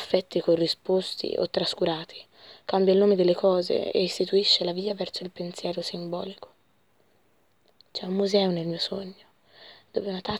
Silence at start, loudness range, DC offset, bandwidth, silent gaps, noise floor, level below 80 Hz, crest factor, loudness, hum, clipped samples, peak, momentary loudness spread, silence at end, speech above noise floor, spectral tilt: 0 s; 9 LU; under 0.1%; 12.5 kHz; none; -67 dBFS; -68 dBFS; 20 dB; -26 LUFS; none; under 0.1%; -6 dBFS; 15 LU; 0 s; 42 dB; -5.5 dB/octave